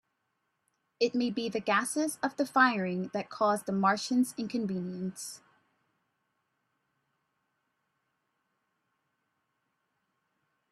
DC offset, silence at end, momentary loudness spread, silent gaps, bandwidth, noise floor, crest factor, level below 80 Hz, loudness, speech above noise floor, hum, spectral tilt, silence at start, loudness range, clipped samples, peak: under 0.1%; 5.35 s; 12 LU; none; 14 kHz; -80 dBFS; 24 dB; -78 dBFS; -30 LUFS; 50 dB; none; -4.5 dB/octave; 1 s; 14 LU; under 0.1%; -10 dBFS